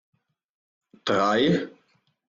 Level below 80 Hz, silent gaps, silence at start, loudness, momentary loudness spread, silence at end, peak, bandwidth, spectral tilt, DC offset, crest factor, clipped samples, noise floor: -64 dBFS; none; 1.05 s; -23 LUFS; 13 LU; 0.6 s; -10 dBFS; 7.6 kHz; -5.5 dB/octave; under 0.1%; 18 dB; under 0.1%; -68 dBFS